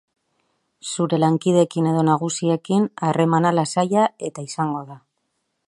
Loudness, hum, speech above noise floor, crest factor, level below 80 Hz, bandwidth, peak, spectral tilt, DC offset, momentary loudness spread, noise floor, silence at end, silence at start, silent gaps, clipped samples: -20 LUFS; none; 54 dB; 18 dB; -68 dBFS; 11.5 kHz; -4 dBFS; -6 dB/octave; under 0.1%; 12 LU; -73 dBFS; 0.7 s; 0.85 s; none; under 0.1%